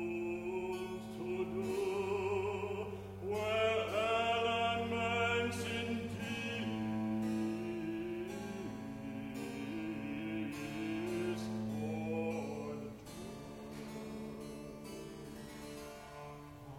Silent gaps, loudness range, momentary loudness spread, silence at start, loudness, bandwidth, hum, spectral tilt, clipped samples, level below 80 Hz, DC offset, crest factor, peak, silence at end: none; 11 LU; 15 LU; 0 s; -39 LUFS; 16.5 kHz; none; -5.5 dB/octave; under 0.1%; -64 dBFS; under 0.1%; 16 dB; -22 dBFS; 0 s